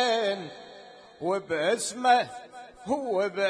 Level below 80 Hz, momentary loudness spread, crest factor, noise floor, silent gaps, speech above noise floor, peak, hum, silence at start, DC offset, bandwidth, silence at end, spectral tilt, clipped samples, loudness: -70 dBFS; 22 LU; 18 dB; -49 dBFS; none; 23 dB; -10 dBFS; none; 0 s; under 0.1%; 10.5 kHz; 0 s; -3 dB/octave; under 0.1%; -27 LUFS